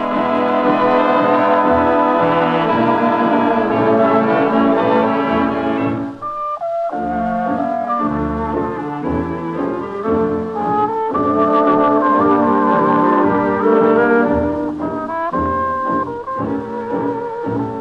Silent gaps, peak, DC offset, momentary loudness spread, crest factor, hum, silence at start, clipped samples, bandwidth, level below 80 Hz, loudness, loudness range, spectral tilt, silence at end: none; -2 dBFS; under 0.1%; 8 LU; 14 dB; none; 0 s; under 0.1%; 6.4 kHz; -42 dBFS; -16 LUFS; 6 LU; -8.5 dB/octave; 0 s